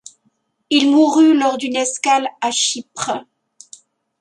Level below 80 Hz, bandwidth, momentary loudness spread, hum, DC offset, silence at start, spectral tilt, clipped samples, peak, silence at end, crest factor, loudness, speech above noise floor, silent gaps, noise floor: -72 dBFS; 11.5 kHz; 12 LU; none; under 0.1%; 0.7 s; -1.5 dB/octave; under 0.1%; -2 dBFS; 1 s; 16 dB; -16 LUFS; 49 dB; none; -65 dBFS